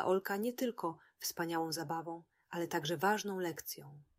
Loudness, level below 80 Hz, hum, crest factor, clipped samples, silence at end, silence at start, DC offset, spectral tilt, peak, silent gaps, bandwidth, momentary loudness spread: -38 LUFS; -80 dBFS; none; 20 dB; under 0.1%; 0.15 s; 0 s; under 0.1%; -4 dB/octave; -18 dBFS; none; 16 kHz; 12 LU